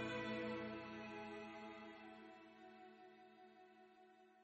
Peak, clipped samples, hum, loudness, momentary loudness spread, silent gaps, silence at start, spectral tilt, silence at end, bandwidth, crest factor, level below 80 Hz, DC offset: -34 dBFS; under 0.1%; none; -51 LUFS; 21 LU; none; 0 s; -3.5 dB/octave; 0 s; 8 kHz; 18 dB; -82 dBFS; under 0.1%